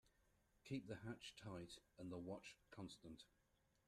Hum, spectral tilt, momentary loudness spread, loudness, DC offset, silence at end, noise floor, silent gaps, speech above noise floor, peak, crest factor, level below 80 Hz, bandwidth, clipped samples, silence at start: none; -5.5 dB/octave; 9 LU; -56 LUFS; under 0.1%; 0.6 s; -81 dBFS; none; 25 dB; -38 dBFS; 20 dB; -80 dBFS; 13 kHz; under 0.1%; 0.05 s